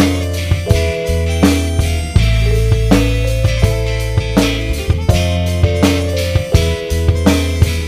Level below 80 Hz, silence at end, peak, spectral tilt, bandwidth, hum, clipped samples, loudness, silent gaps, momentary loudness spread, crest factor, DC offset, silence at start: -18 dBFS; 0 s; 0 dBFS; -6 dB/octave; 16 kHz; none; under 0.1%; -15 LUFS; none; 4 LU; 14 dB; under 0.1%; 0 s